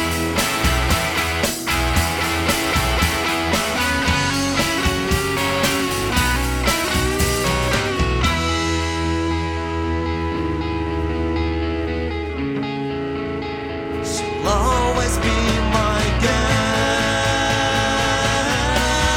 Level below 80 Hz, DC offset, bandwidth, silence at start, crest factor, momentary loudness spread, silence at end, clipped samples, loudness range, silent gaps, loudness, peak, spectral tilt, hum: -28 dBFS; under 0.1%; 19.5 kHz; 0 s; 16 dB; 6 LU; 0 s; under 0.1%; 5 LU; none; -19 LUFS; -4 dBFS; -4 dB/octave; none